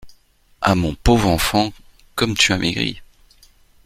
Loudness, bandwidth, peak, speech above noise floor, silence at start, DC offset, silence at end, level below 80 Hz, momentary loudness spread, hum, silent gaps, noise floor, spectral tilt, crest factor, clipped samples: -18 LUFS; 16.5 kHz; 0 dBFS; 36 dB; 0.05 s; under 0.1%; 0.8 s; -32 dBFS; 9 LU; none; none; -54 dBFS; -4 dB/octave; 20 dB; under 0.1%